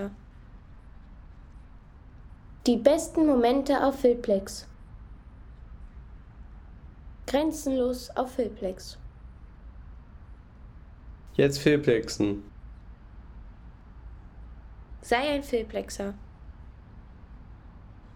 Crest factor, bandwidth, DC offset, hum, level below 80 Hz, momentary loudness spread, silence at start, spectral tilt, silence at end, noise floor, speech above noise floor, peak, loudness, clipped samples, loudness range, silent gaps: 24 dB; 18.5 kHz; under 0.1%; none; -48 dBFS; 27 LU; 0 s; -5.5 dB/octave; 0.05 s; -49 dBFS; 23 dB; -6 dBFS; -26 LUFS; under 0.1%; 10 LU; none